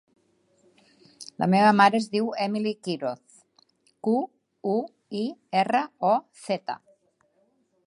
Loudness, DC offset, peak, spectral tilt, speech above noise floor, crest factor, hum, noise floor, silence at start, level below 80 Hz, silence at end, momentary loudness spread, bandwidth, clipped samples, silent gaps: -25 LUFS; under 0.1%; -4 dBFS; -6 dB/octave; 44 dB; 22 dB; none; -68 dBFS; 1.2 s; -74 dBFS; 1.1 s; 17 LU; 11.5 kHz; under 0.1%; none